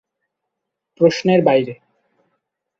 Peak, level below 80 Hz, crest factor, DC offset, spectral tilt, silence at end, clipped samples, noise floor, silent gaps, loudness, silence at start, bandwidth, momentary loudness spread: -2 dBFS; -62 dBFS; 18 dB; under 0.1%; -6.5 dB/octave; 1.05 s; under 0.1%; -79 dBFS; none; -16 LUFS; 1 s; 7.6 kHz; 6 LU